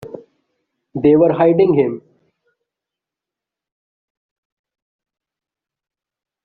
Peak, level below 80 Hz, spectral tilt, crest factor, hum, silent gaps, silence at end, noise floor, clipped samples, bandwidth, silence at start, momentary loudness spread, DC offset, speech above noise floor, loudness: -2 dBFS; -58 dBFS; -8 dB/octave; 18 dB; none; none; 4.45 s; -86 dBFS; under 0.1%; 4.6 kHz; 0 s; 20 LU; under 0.1%; 74 dB; -14 LUFS